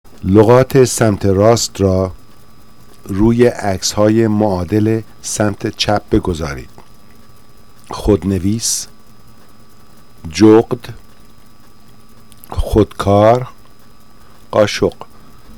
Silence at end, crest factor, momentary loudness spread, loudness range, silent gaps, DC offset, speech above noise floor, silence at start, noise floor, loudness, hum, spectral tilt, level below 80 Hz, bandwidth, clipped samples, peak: 0.65 s; 16 dB; 15 LU; 6 LU; none; 2%; 33 dB; 0.25 s; -46 dBFS; -14 LUFS; none; -5.5 dB/octave; -34 dBFS; 18.5 kHz; 0.2%; 0 dBFS